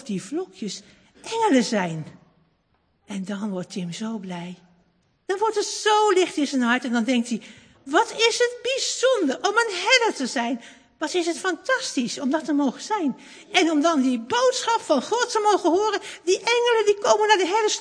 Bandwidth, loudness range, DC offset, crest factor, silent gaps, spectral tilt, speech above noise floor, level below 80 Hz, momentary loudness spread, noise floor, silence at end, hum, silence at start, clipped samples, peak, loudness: 10.5 kHz; 6 LU; under 0.1%; 20 dB; none; -3 dB/octave; 45 dB; -72 dBFS; 13 LU; -67 dBFS; 0 s; none; 0 s; under 0.1%; -2 dBFS; -22 LUFS